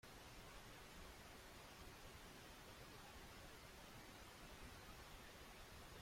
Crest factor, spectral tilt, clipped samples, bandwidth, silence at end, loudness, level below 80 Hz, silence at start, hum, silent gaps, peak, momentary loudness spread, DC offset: 14 dB; -3.5 dB/octave; under 0.1%; 16.5 kHz; 0 s; -59 LUFS; -66 dBFS; 0.05 s; none; none; -46 dBFS; 1 LU; under 0.1%